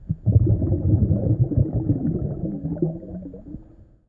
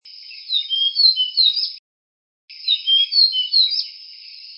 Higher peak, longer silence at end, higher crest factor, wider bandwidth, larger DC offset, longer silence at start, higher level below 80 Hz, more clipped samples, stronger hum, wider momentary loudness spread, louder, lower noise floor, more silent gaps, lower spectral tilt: about the same, -4 dBFS vs -2 dBFS; first, 0.45 s vs 0 s; about the same, 18 dB vs 18 dB; second, 1.6 kHz vs 5.8 kHz; neither; about the same, 0 s vs 0.05 s; first, -34 dBFS vs under -90 dBFS; neither; neither; second, 18 LU vs 22 LU; second, -22 LUFS vs -15 LUFS; first, -48 dBFS vs -39 dBFS; second, none vs 1.79-2.48 s; first, -15.5 dB/octave vs 7 dB/octave